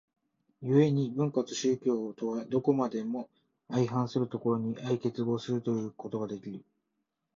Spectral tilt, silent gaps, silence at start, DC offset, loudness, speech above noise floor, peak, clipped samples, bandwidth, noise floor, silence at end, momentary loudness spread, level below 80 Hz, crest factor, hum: -7 dB/octave; none; 0.6 s; under 0.1%; -31 LUFS; 52 dB; -12 dBFS; under 0.1%; 7.6 kHz; -83 dBFS; 0.8 s; 10 LU; -72 dBFS; 18 dB; none